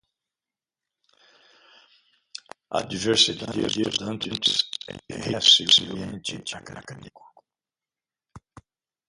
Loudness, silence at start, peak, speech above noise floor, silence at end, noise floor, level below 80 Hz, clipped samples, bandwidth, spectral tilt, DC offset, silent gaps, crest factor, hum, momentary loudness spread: -21 LUFS; 2.35 s; -4 dBFS; over 65 dB; 0.7 s; under -90 dBFS; -60 dBFS; under 0.1%; 11.5 kHz; -2.5 dB/octave; under 0.1%; none; 24 dB; none; 25 LU